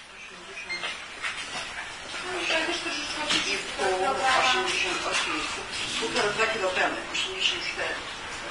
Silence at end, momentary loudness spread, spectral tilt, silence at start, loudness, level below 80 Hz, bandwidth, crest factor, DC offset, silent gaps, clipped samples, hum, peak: 0 s; 11 LU; -1 dB/octave; 0 s; -27 LUFS; -56 dBFS; 11 kHz; 20 dB; under 0.1%; none; under 0.1%; none; -10 dBFS